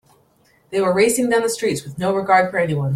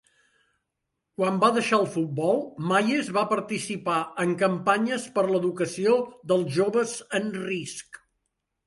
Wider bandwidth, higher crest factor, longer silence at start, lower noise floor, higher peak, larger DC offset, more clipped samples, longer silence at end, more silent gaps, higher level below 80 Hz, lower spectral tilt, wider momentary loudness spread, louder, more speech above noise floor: first, 16 kHz vs 11.5 kHz; about the same, 18 dB vs 20 dB; second, 0.7 s vs 1.2 s; second, -57 dBFS vs -82 dBFS; first, -2 dBFS vs -6 dBFS; neither; neither; second, 0 s vs 0.7 s; neither; first, -56 dBFS vs -70 dBFS; about the same, -5 dB/octave vs -5 dB/octave; about the same, 7 LU vs 7 LU; first, -18 LUFS vs -25 LUFS; second, 39 dB vs 57 dB